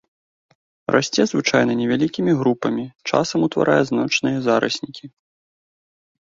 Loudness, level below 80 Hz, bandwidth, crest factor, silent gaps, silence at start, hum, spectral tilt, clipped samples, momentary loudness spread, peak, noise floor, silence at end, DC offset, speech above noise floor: -19 LUFS; -60 dBFS; 7.8 kHz; 20 dB; 2.95-2.99 s; 0.9 s; none; -5 dB/octave; under 0.1%; 8 LU; -2 dBFS; under -90 dBFS; 1.15 s; under 0.1%; over 71 dB